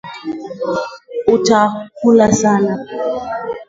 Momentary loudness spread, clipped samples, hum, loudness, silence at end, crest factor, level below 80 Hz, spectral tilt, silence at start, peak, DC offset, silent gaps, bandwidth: 14 LU; under 0.1%; none; -15 LUFS; 0.05 s; 16 dB; -50 dBFS; -5 dB/octave; 0.05 s; 0 dBFS; under 0.1%; none; 7.8 kHz